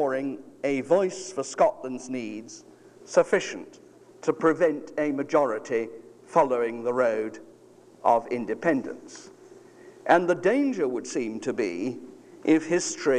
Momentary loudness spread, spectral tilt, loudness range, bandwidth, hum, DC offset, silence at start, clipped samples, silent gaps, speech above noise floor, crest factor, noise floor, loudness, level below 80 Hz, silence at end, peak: 15 LU; -4.5 dB/octave; 3 LU; 11 kHz; none; under 0.1%; 0 s; under 0.1%; none; 28 dB; 20 dB; -53 dBFS; -26 LUFS; -70 dBFS; 0 s; -6 dBFS